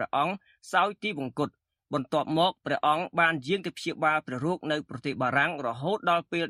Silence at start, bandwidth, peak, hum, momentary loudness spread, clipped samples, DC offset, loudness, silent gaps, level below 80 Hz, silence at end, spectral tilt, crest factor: 0 s; 14 kHz; -10 dBFS; none; 9 LU; under 0.1%; under 0.1%; -28 LUFS; none; -70 dBFS; 0 s; -5.5 dB/octave; 20 dB